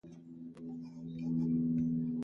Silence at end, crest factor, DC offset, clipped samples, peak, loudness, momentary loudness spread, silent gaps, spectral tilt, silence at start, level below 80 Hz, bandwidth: 0 s; 12 dB; under 0.1%; under 0.1%; -24 dBFS; -36 LUFS; 18 LU; none; -10.5 dB/octave; 0.05 s; -64 dBFS; 5.4 kHz